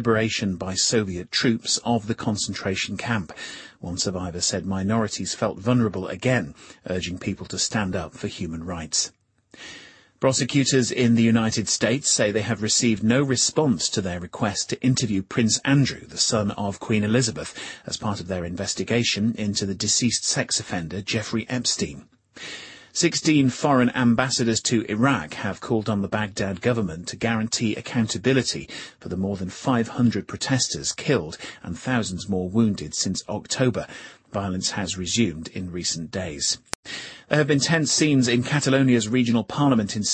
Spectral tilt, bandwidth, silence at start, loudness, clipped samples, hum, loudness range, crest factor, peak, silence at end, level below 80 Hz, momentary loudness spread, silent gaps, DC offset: -4 dB/octave; 10 kHz; 0 s; -23 LUFS; under 0.1%; none; 5 LU; 22 dB; -2 dBFS; 0 s; -54 dBFS; 12 LU; 36.75-36.83 s; under 0.1%